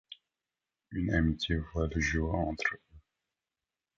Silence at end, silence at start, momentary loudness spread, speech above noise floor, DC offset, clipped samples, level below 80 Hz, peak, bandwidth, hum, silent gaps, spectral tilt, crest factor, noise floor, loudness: 1 s; 0.1 s; 16 LU; over 59 dB; under 0.1%; under 0.1%; -42 dBFS; -14 dBFS; 7.6 kHz; none; none; -5.5 dB/octave; 20 dB; under -90 dBFS; -32 LUFS